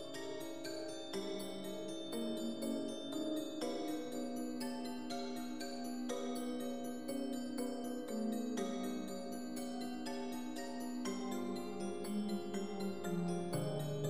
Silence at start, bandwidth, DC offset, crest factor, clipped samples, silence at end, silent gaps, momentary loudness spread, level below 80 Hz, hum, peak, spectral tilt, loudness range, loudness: 0 s; 15.5 kHz; 0.3%; 14 dB; under 0.1%; 0 s; none; 5 LU; -80 dBFS; none; -28 dBFS; -5 dB/octave; 1 LU; -42 LUFS